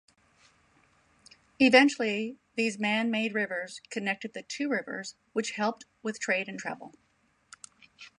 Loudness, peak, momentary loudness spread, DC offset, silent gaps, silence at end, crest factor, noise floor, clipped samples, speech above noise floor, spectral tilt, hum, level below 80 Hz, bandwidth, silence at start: -29 LUFS; -6 dBFS; 17 LU; under 0.1%; none; 0.1 s; 26 dB; -70 dBFS; under 0.1%; 41 dB; -3.5 dB/octave; none; -76 dBFS; 11 kHz; 1.6 s